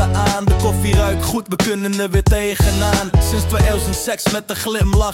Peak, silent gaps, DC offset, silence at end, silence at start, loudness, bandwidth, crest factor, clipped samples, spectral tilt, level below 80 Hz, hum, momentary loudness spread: -2 dBFS; none; under 0.1%; 0 s; 0 s; -17 LUFS; 16.5 kHz; 14 dB; under 0.1%; -5 dB/octave; -22 dBFS; none; 4 LU